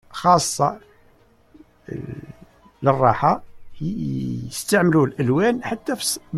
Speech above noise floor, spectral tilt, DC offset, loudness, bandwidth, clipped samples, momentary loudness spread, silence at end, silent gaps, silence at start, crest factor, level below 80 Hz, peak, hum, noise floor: 35 dB; -5 dB/octave; under 0.1%; -20 LUFS; 15.5 kHz; under 0.1%; 16 LU; 0 s; none; 0.1 s; 20 dB; -52 dBFS; -2 dBFS; none; -55 dBFS